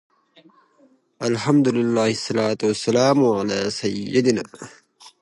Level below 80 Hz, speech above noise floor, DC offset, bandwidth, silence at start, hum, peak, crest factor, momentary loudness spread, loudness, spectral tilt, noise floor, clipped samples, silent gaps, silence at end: -62 dBFS; 38 dB; under 0.1%; 11.5 kHz; 1.2 s; none; -4 dBFS; 18 dB; 9 LU; -20 LUFS; -5.5 dB/octave; -58 dBFS; under 0.1%; none; 0.1 s